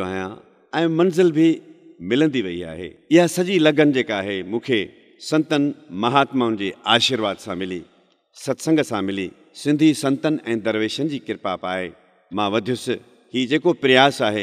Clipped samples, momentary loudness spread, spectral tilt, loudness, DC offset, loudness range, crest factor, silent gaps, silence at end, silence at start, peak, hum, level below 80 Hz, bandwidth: under 0.1%; 13 LU; -5 dB/octave; -20 LUFS; under 0.1%; 3 LU; 20 dB; none; 0 s; 0 s; 0 dBFS; none; -64 dBFS; 14.5 kHz